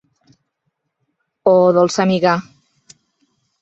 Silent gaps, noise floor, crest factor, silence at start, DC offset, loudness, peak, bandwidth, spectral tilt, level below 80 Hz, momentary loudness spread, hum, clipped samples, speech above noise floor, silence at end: none; -73 dBFS; 16 dB; 1.45 s; under 0.1%; -15 LUFS; -2 dBFS; 8.2 kHz; -6 dB/octave; -62 dBFS; 7 LU; none; under 0.1%; 59 dB; 1.2 s